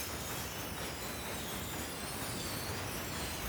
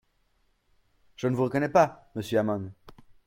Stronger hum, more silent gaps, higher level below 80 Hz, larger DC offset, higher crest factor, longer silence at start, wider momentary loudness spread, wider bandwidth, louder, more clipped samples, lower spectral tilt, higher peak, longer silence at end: neither; neither; first, -52 dBFS vs -62 dBFS; neither; second, 14 dB vs 22 dB; second, 0 s vs 1.2 s; second, 2 LU vs 12 LU; first, over 20 kHz vs 16.5 kHz; second, -39 LUFS vs -27 LUFS; neither; second, -3 dB/octave vs -7 dB/octave; second, -26 dBFS vs -8 dBFS; second, 0 s vs 0.35 s